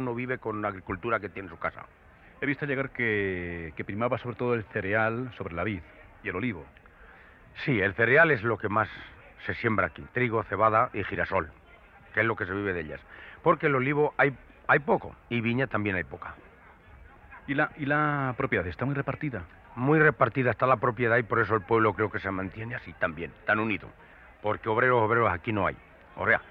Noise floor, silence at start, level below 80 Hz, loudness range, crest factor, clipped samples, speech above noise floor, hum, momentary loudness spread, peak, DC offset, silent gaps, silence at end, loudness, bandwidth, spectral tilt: -54 dBFS; 0 s; -56 dBFS; 6 LU; 20 dB; under 0.1%; 26 dB; none; 13 LU; -8 dBFS; under 0.1%; none; 0 s; -27 LUFS; 5.6 kHz; -9.5 dB/octave